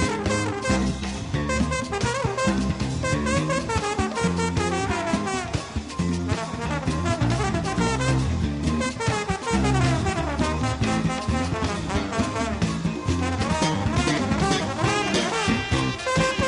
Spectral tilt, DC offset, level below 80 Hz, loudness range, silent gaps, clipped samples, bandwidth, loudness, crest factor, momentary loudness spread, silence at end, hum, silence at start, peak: -5 dB/octave; under 0.1%; -36 dBFS; 2 LU; none; under 0.1%; 11 kHz; -24 LUFS; 16 dB; 4 LU; 0 s; none; 0 s; -8 dBFS